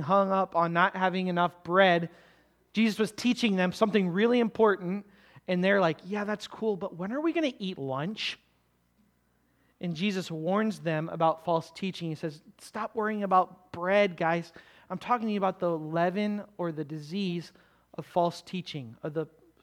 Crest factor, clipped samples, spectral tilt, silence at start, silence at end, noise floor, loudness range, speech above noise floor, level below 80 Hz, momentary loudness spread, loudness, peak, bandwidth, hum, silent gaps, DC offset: 22 dB; under 0.1%; -6 dB/octave; 0 s; 0.35 s; -70 dBFS; 7 LU; 41 dB; -72 dBFS; 13 LU; -29 LUFS; -8 dBFS; 14 kHz; none; none; under 0.1%